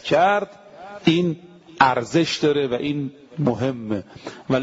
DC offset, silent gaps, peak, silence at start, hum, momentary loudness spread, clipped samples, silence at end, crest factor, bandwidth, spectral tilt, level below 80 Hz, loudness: under 0.1%; none; -2 dBFS; 0.05 s; none; 17 LU; under 0.1%; 0 s; 20 dB; 7.8 kHz; -6 dB/octave; -58 dBFS; -21 LUFS